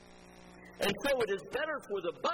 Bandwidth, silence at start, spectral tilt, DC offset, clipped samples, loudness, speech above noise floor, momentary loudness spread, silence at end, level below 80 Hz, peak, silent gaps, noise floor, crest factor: 17.5 kHz; 0 s; -3.5 dB/octave; under 0.1%; under 0.1%; -34 LUFS; 21 dB; 22 LU; 0 s; -62 dBFS; -18 dBFS; none; -55 dBFS; 18 dB